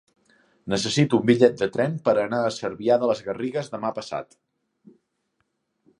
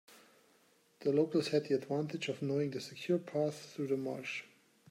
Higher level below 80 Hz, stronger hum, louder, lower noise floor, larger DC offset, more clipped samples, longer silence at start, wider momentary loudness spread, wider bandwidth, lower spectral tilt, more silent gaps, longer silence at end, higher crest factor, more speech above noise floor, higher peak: first, -62 dBFS vs -84 dBFS; neither; first, -23 LUFS vs -36 LUFS; first, -74 dBFS vs -69 dBFS; neither; neither; first, 0.65 s vs 0.1 s; first, 12 LU vs 9 LU; second, 11.5 kHz vs 15.5 kHz; about the same, -5.5 dB/octave vs -6 dB/octave; neither; first, 1.75 s vs 0.45 s; about the same, 22 dB vs 18 dB; first, 52 dB vs 34 dB; first, -2 dBFS vs -20 dBFS